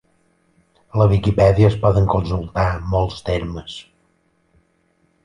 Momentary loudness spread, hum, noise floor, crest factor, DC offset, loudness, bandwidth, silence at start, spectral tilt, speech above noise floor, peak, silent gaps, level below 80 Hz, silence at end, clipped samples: 15 LU; none; -63 dBFS; 18 dB; under 0.1%; -18 LUFS; 9.8 kHz; 0.95 s; -8 dB/octave; 46 dB; -2 dBFS; none; -32 dBFS; 1.45 s; under 0.1%